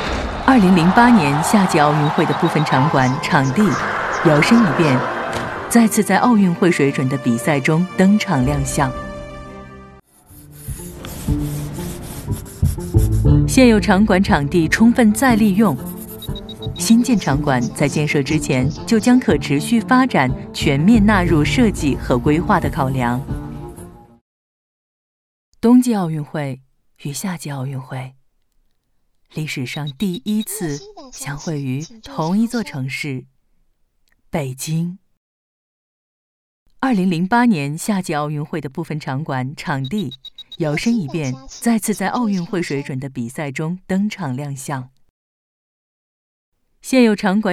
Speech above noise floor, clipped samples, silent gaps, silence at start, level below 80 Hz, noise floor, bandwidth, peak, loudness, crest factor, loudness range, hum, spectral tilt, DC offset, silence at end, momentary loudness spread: 46 dB; under 0.1%; 24.21-25.52 s, 35.17-36.66 s, 45.10-46.52 s; 0 s; -34 dBFS; -62 dBFS; 14.5 kHz; 0 dBFS; -17 LUFS; 18 dB; 12 LU; none; -6 dB/octave; under 0.1%; 0 s; 16 LU